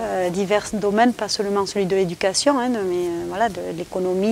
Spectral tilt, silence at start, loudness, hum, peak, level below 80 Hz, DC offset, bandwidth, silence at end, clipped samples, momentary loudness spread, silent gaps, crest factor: -4 dB/octave; 0 s; -21 LUFS; none; -4 dBFS; -52 dBFS; under 0.1%; 16 kHz; 0 s; under 0.1%; 6 LU; none; 16 dB